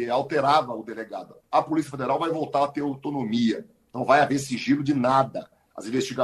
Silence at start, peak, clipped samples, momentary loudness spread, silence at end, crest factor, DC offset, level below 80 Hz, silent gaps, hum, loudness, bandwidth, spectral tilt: 0 s; -6 dBFS; under 0.1%; 15 LU; 0 s; 20 dB; under 0.1%; -64 dBFS; none; none; -24 LUFS; 12.5 kHz; -5.5 dB/octave